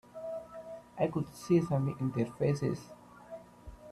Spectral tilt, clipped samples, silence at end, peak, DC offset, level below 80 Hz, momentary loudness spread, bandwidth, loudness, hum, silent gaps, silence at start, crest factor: -8 dB/octave; under 0.1%; 0 s; -16 dBFS; under 0.1%; -62 dBFS; 21 LU; 13.5 kHz; -33 LUFS; 60 Hz at -60 dBFS; none; 0.15 s; 18 dB